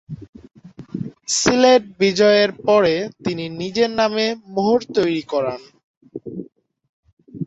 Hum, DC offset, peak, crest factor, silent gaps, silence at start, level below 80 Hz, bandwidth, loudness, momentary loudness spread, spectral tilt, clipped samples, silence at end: none; under 0.1%; -2 dBFS; 18 dB; 0.29-0.33 s, 5.84-6.01 s, 6.89-7.03 s, 7.13-7.17 s; 0.1 s; -56 dBFS; 8.2 kHz; -18 LUFS; 20 LU; -4 dB/octave; under 0.1%; 0 s